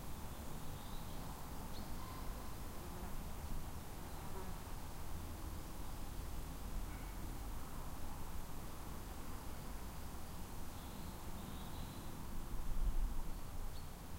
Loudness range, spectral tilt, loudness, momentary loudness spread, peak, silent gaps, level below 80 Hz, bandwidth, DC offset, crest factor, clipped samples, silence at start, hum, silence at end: 2 LU; -5 dB/octave; -50 LUFS; 2 LU; -28 dBFS; none; -46 dBFS; 16 kHz; under 0.1%; 16 dB; under 0.1%; 0 s; none; 0 s